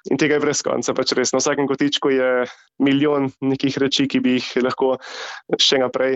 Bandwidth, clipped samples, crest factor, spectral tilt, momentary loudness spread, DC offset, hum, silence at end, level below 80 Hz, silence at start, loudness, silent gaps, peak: 8.2 kHz; under 0.1%; 14 dB; -3.5 dB/octave; 6 LU; under 0.1%; none; 0 s; -62 dBFS; 0.05 s; -19 LUFS; none; -6 dBFS